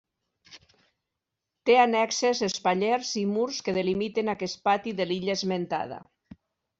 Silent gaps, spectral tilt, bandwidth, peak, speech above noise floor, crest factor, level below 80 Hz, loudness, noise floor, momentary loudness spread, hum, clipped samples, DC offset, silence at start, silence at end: none; -4 dB/octave; 8 kHz; -8 dBFS; 59 dB; 18 dB; -68 dBFS; -26 LUFS; -85 dBFS; 9 LU; none; under 0.1%; under 0.1%; 0.5 s; 0.75 s